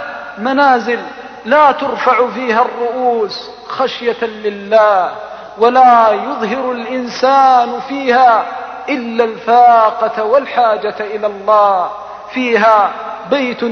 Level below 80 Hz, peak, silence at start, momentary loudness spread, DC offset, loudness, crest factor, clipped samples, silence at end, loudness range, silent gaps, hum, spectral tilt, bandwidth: -58 dBFS; 0 dBFS; 0 s; 13 LU; under 0.1%; -12 LUFS; 12 dB; under 0.1%; 0 s; 3 LU; none; none; -4.5 dB/octave; 6.6 kHz